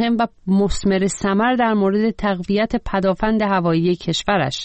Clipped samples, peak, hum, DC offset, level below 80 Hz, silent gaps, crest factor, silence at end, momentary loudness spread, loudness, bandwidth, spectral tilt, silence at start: under 0.1%; -6 dBFS; none; 0.1%; -36 dBFS; none; 12 dB; 0 s; 3 LU; -19 LUFS; 8.4 kHz; -5.5 dB/octave; 0 s